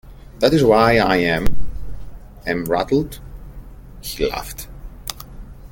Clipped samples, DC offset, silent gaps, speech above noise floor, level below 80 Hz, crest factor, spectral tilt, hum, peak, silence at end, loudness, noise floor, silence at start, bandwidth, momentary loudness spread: under 0.1%; under 0.1%; none; 21 dB; -34 dBFS; 18 dB; -5.5 dB/octave; none; -2 dBFS; 0.05 s; -18 LUFS; -37 dBFS; 0.05 s; 17 kHz; 24 LU